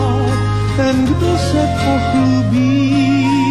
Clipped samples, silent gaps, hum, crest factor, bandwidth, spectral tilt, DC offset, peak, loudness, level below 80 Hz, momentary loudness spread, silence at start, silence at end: under 0.1%; none; none; 8 dB; 12.5 kHz; -7 dB/octave; 1%; -6 dBFS; -14 LUFS; -30 dBFS; 3 LU; 0 s; 0 s